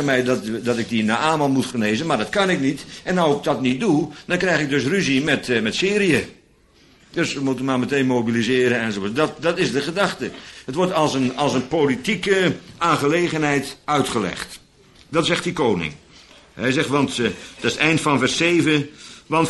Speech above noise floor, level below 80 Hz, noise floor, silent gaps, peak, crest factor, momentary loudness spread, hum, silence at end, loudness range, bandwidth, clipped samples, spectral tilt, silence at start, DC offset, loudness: 34 dB; -52 dBFS; -54 dBFS; none; -2 dBFS; 18 dB; 7 LU; none; 0 s; 2 LU; 12 kHz; under 0.1%; -5 dB/octave; 0 s; under 0.1%; -20 LUFS